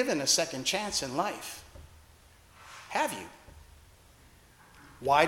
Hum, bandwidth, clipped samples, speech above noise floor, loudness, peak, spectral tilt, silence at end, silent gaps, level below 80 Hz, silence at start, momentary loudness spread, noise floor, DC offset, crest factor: none; 17.5 kHz; under 0.1%; 27 dB; -30 LUFS; -8 dBFS; -2 dB/octave; 0 s; none; -60 dBFS; 0 s; 23 LU; -58 dBFS; under 0.1%; 24 dB